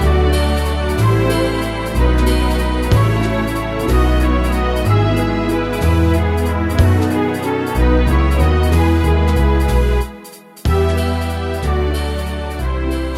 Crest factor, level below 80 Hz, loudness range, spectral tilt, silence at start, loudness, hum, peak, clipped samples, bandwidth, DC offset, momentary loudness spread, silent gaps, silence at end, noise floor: 14 dB; -18 dBFS; 2 LU; -6.5 dB/octave; 0 s; -16 LUFS; none; -2 dBFS; under 0.1%; 15 kHz; under 0.1%; 7 LU; none; 0 s; -37 dBFS